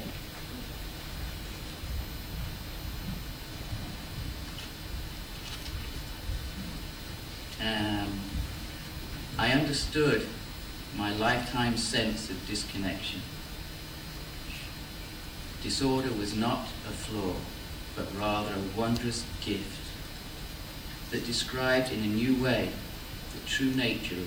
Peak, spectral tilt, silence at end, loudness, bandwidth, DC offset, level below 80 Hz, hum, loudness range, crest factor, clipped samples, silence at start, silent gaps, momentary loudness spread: -14 dBFS; -4.5 dB/octave; 0 s; -33 LUFS; over 20 kHz; under 0.1%; -44 dBFS; none; 9 LU; 20 dB; under 0.1%; 0 s; none; 14 LU